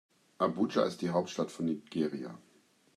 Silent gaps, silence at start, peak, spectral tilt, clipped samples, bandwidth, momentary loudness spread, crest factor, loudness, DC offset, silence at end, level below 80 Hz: none; 0.4 s; -14 dBFS; -6 dB/octave; under 0.1%; 13 kHz; 11 LU; 20 dB; -33 LUFS; under 0.1%; 0.55 s; -80 dBFS